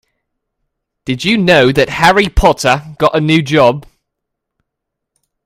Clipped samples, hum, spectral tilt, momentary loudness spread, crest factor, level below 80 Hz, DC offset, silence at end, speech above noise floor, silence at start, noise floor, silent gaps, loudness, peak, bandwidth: 0.2%; none; -5 dB/octave; 8 LU; 14 dB; -26 dBFS; under 0.1%; 1.65 s; 66 dB; 1.05 s; -77 dBFS; none; -11 LUFS; 0 dBFS; 16.5 kHz